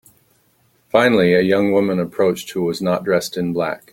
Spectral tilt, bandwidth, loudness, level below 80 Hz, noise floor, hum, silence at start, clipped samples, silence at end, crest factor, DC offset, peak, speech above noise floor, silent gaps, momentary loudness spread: -6 dB/octave; 17 kHz; -18 LUFS; -56 dBFS; -60 dBFS; none; 0.95 s; under 0.1%; 0.15 s; 18 dB; under 0.1%; 0 dBFS; 43 dB; none; 8 LU